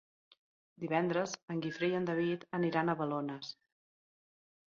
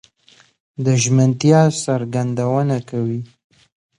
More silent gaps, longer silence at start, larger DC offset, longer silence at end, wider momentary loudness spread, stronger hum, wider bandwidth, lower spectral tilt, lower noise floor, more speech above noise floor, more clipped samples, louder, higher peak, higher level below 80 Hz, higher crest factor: first, 1.43-1.48 s vs none; about the same, 0.8 s vs 0.8 s; neither; first, 1.15 s vs 0.75 s; about the same, 13 LU vs 12 LU; neither; second, 7.4 kHz vs 11 kHz; about the same, -5 dB/octave vs -6 dB/octave; first, under -90 dBFS vs -53 dBFS; first, over 55 dB vs 36 dB; neither; second, -35 LUFS vs -17 LUFS; second, -18 dBFS vs 0 dBFS; second, -78 dBFS vs -58 dBFS; about the same, 20 dB vs 18 dB